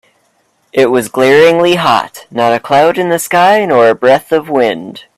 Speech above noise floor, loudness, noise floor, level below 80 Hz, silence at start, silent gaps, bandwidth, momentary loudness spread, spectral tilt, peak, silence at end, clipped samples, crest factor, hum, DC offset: 47 dB; -10 LUFS; -57 dBFS; -54 dBFS; 0.75 s; none; 15 kHz; 8 LU; -4.5 dB/octave; 0 dBFS; 0.2 s; under 0.1%; 10 dB; none; under 0.1%